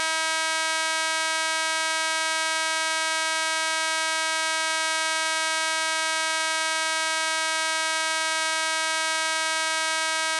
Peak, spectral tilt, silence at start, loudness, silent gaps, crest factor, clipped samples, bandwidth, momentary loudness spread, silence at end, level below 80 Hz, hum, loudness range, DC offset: -10 dBFS; 4.5 dB/octave; 0 s; -23 LUFS; none; 16 dB; under 0.1%; 13 kHz; 0 LU; 0 s; -86 dBFS; none; 0 LU; under 0.1%